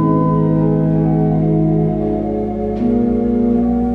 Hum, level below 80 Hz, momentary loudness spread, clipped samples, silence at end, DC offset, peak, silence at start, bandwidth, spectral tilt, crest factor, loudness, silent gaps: none; -32 dBFS; 4 LU; under 0.1%; 0 s; under 0.1%; -2 dBFS; 0 s; 3.5 kHz; -12 dB/octave; 12 dB; -16 LUFS; none